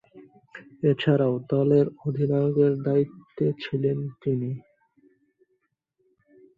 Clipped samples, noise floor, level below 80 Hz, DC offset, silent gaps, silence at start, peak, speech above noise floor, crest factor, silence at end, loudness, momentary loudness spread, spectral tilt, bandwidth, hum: under 0.1%; -74 dBFS; -66 dBFS; under 0.1%; none; 0.15 s; -8 dBFS; 51 dB; 18 dB; 1.95 s; -25 LUFS; 8 LU; -10 dB/octave; 5.2 kHz; none